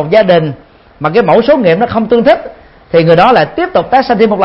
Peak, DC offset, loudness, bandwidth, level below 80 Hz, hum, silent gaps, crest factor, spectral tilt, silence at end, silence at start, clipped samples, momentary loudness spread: 0 dBFS; under 0.1%; -9 LUFS; 5.8 kHz; -40 dBFS; none; none; 8 dB; -8.5 dB/octave; 0 s; 0 s; 0.4%; 7 LU